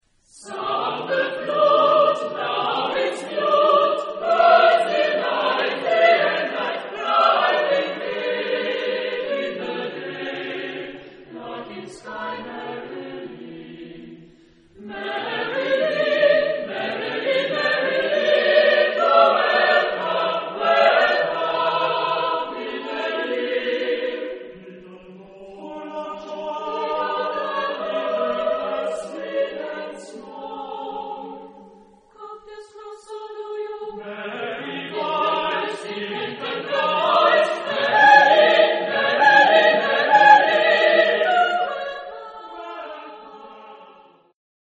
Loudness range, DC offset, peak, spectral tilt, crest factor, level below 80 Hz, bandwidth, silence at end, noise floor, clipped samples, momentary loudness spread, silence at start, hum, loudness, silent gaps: 18 LU; under 0.1%; 0 dBFS; -3.5 dB/octave; 20 dB; -66 dBFS; 10 kHz; 0.8 s; -51 dBFS; under 0.1%; 20 LU; 0.35 s; none; -19 LUFS; none